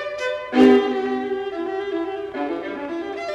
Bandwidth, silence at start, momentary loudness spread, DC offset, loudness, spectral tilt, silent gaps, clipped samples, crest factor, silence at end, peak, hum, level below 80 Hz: 8.4 kHz; 0 s; 14 LU; under 0.1%; -21 LUFS; -5 dB/octave; none; under 0.1%; 20 dB; 0 s; -2 dBFS; none; -58 dBFS